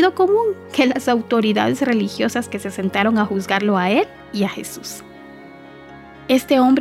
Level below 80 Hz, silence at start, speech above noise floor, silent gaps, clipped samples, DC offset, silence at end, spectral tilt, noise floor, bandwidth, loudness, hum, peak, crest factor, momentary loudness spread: -58 dBFS; 0 s; 22 dB; none; under 0.1%; under 0.1%; 0 s; -5 dB/octave; -40 dBFS; 15.5 kHz; -19 LUFS; none; -2 dBFS; 18 dB; 15 LU